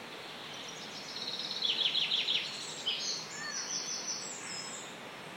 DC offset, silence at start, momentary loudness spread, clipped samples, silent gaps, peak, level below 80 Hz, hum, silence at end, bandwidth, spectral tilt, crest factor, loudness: under 0.1%; 0 s; 14 LU; under 0.1%; none; -18 dBFS; -84 dBFS; none; 0 s; 16.5 kHz; 0 dB/octave; 20 dB; -34 LUFS